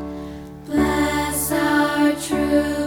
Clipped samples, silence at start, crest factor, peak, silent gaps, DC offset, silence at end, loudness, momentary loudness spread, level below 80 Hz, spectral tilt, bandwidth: under 0.1%; 0 s; 14 dB; -6 dBFS; none; under 0.1%; 0 s; -20 LUFS; 14 LU; -38 dBFS; -4 dB/octave; 18 kHz